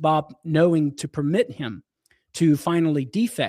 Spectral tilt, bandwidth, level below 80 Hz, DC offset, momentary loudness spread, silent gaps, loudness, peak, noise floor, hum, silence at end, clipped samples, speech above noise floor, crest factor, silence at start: -6.5 dB/octave; 15.5 kHz; -62 dBFS; under 0.1%; 14 LU; none; -22 LUFS; -6 dBFS; -52 dBFS; none; 0 s; under 0.1%; 30 dB; 16 dB; 0 s